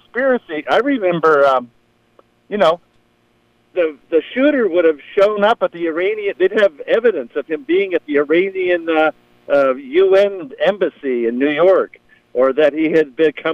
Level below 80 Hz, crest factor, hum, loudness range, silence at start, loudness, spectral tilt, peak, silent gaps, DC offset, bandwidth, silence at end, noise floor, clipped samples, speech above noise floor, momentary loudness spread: -62 dBFS; 14 dB; 60 Hz at -55 dBFS; 3 LU; 0.15 s; -16 LUFS; -6.5 dB/octave; -2 dBFS; none; under 0.1%; 8 kHz; 0 s; -58 dBFS; under 0.1%; 43 dB; 7 LU